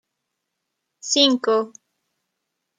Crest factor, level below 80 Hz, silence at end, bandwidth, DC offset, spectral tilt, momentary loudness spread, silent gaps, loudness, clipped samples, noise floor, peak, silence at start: 22 dB; -80 dBFS; 1.1 s; 9.6 kHz; under 0.1%; -1.5 dB/octave; 18 LU; none; -18 LUFS; under 0.1%; -79 dBFS; -4 dBFS; 1.05 s